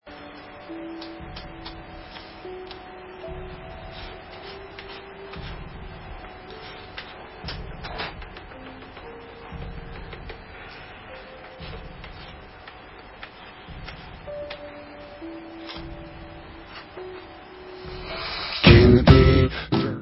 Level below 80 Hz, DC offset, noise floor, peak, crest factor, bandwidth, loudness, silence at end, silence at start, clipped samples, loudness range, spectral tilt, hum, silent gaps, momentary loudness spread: -34 dBFS; under 0.1%; -44 dBFS; 0 dBFS; 26 dB; 5.8 kHz; -20 LUFS; 0 s; 0.05 s; under 0.1%; 20 LU; -9.5 dB/octave; none; none; 21 LU